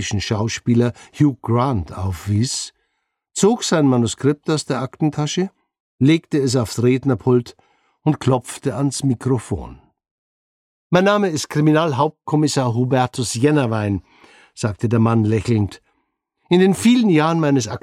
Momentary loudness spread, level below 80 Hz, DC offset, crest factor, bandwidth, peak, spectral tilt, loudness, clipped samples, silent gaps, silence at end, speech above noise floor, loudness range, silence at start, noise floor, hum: 9 LU; -48 dBFS; under 0.1%; 16 dB; 14.5 kHz; -2 dBFS; -6 dB/octave; -18 LUFS; under 0.1%; 5.80-5.99 s, 10.11-10.90 s; 0.05 s; 56 dB; 3 LU; 0 s; -73 dBFS; none